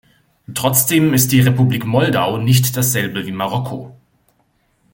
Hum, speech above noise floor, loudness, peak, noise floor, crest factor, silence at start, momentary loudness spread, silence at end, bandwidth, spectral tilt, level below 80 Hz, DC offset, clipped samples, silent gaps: none; 46 dB; -15 LUFS; 0 dBFS; -61 dBFS; 16 dB; 0.5 s; 10 LU; 1 s; 17 kHz; -4.5 dB/octave; -50 dBFS; under 0.1%; under 0.1%; none